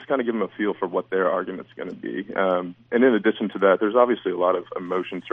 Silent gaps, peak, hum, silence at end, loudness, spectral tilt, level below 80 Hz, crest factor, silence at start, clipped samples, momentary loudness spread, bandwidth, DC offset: none; -4 dBFS; none; 0.05 s; -23 LUFS; -8.5 dB/octave; -72 dBFS; 18 dB; 0 s; under 0.1%; 12 LU; 3.8 kHz; under 0.1%